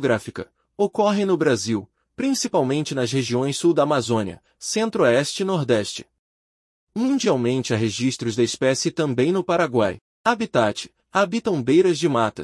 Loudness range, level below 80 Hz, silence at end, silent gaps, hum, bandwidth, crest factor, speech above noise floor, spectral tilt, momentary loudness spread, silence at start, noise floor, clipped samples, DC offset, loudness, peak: 2 LU; -62 dBFS; 0 s; 6.19-6.87 s, 10.01-10.24 s; none; 12 kHz; 16 dB; over 69 dB; -5 dB/octave; 8 LU; 0 s; under -90 dBFS; under 0.1%; under 0.1%; -21 LUFS; -4 dBFS